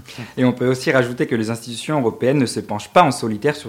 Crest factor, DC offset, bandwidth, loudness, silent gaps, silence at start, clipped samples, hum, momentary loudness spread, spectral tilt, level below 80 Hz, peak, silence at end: 18 dB; under 0.1%; 16 kHz; -19 LUFS; none; 0.1 s; under 0.1%; none; 9 LU; -5.5 dB/octave; -58 dBFS; 0 dBFS; 0 s